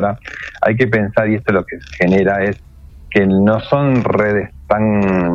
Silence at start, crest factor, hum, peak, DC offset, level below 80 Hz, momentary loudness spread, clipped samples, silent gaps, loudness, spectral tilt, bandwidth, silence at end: 0 s; 14 dB; none; 0 dBFS; under 0.1%; -40 dBFS; 7 LU; under 0.1%; none; -15 LUFS; -8.5 dB/octave; 7 kHz; 0 s